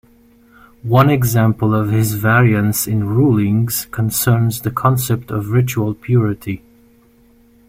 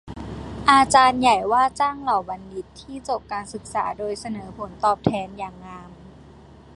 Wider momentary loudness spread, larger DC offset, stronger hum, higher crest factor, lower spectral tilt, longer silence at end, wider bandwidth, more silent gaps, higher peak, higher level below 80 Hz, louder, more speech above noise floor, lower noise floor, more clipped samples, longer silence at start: second, 8 LU vs 20 LU; neither; neither; second, 16 dB vs 22 dB; first, -6 dB/octave vs -4 dB/octave; first, 1.1 s vs 0.55 s; first, 16.5 kHz vs 11.5 kHz; neither; about the same, 0 dBFS vs 0 dBFS; about the same, -44 dBFS vs -48 dBFS; first, -16 LUFS vs -21 LUFS; first, 35 dB vs 24 dB; first, -50 dBFS vs -46 dBFS; neither; first, 0.85 s vs 0.05 s